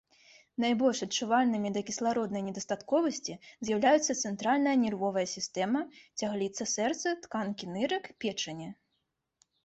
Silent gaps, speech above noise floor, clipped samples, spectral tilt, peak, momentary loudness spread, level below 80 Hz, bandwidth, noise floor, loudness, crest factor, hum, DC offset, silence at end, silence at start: none; 51 dB; under 0.1%; -3.5 dB/octave; -14 dBFS; 10 LU; -72 dBFS; 8.2 kHz; -81 dBFS; -31 LUFS; 18 dB; none; under 0.1%; 0.9 s; 0.6 s